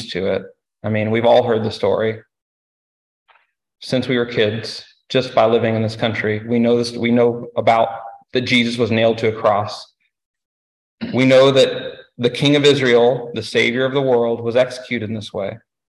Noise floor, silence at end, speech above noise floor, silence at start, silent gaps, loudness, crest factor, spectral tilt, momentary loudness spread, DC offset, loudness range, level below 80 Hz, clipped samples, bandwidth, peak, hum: under -90 dBFS; 0.3 s; over 73 dB; 0 s; 2.42-3.26 s, 10.25-10.34 s, 10.45-10.98 s; -17 LUFS; 16 dB; -5.5 dB/octave; 13 LU; under 0.1%; 5 LU; -56 dBFS; under 0.1%; 12 kHz; -2 dBFS; none